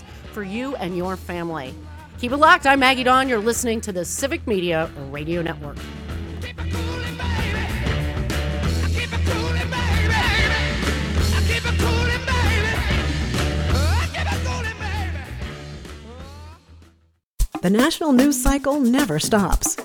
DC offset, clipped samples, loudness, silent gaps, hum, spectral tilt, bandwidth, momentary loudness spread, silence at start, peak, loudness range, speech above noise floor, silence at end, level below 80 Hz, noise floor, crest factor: under 0.1%; under 0.1%; -21 LUFS; 17.23-17.38 s; none; -4.5 dB/octave; 19 kHz; 16 LU; 0 s; 0 dBFS; 8 LU; 40 dB; 0 s; -30 dBFS; -60 dBFS; 20 dB